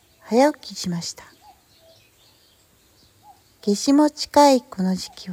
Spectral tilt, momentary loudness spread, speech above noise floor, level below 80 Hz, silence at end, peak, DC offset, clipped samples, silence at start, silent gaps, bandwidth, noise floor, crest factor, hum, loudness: -5 dB/octave; 14 LU; 38 dB; -60 dBFS; 0 s; -2 dBFS; under 0.1%; under 0.1%; 0.3 s; none; 17 kHz; -58 dBFS; 20 dB; none; -20 LUFS